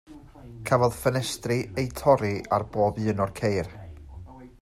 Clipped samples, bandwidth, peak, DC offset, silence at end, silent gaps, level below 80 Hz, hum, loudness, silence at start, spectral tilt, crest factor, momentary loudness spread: under 0.1%; 16 kHz; -6 dBFS; under 0.1%; 0.15 s; none; -50 dBFS; none; -26 LUFS; 0.1 s; -6 dB/octave; 20 dB; 22 LU